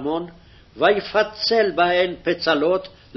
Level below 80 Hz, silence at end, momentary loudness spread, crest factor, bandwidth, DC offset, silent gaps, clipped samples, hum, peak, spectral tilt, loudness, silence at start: -52 dBFS; 0.3 s; 8 LU; 16 dB; 6.2 kHz; under 0.1%; none; under 0.1%; none; -4 dBFS; -5 dB/octave; -20 LUFS; 0 s